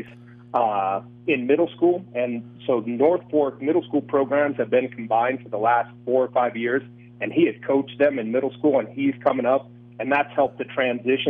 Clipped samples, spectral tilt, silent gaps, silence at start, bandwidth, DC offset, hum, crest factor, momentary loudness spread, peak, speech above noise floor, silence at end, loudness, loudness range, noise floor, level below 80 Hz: under 0.1%; -9 dB/octave; none; 0 s; 3.9 kHz; under 0.1%; 60 Hz at -40 dBFS; 16 dB; 6 LU; -6 dBFS; 23 dB; 0 s; -23 LUFS; 1 LU; -45 dBFS; -72 dBFS